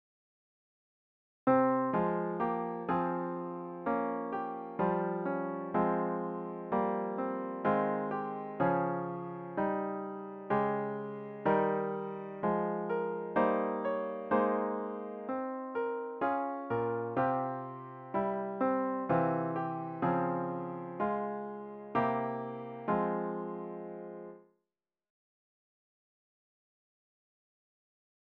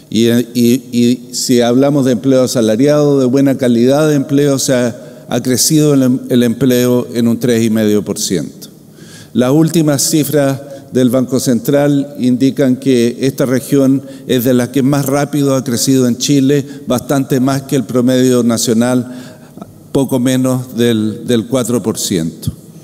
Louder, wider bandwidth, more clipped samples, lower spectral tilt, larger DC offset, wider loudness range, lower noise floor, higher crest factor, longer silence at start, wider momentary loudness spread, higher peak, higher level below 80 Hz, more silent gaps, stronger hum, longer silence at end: second, -34 LUFS vs -12 LUFS; second, 4.9 kHz vs 16.5 kHz; neither; first, -7 dB/octave vs -5.5 dB/octave; neither; about the same, 3 LU vs 3 LU; first, under -90 dBFS vs -36 dBFS; first, 20 dB vs 12 dB; first, 1.45 s vs 0.1 s; first, 10 LU vs 6 LU; second, -14 dBFS vs 0 dBFS; second, -70 dBFS vs -52 dBFS; neither; neither; first, 3.95 s vs 0.05 s